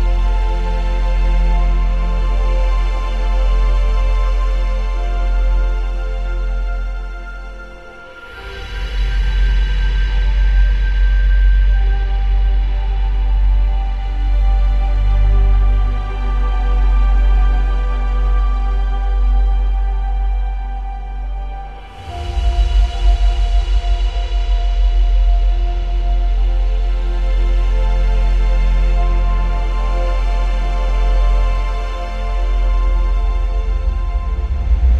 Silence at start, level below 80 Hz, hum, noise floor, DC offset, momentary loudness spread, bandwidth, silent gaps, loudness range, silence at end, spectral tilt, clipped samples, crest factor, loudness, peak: 0 s; -14 dBFS; none; -34 dBFS; under 0.1%; 8 LU; 5.2 kHz; none; 5 LU; 0 s; -6.5 dB/octave; under 0.1%; 10 dB; -19 LUFS; -4 dBFS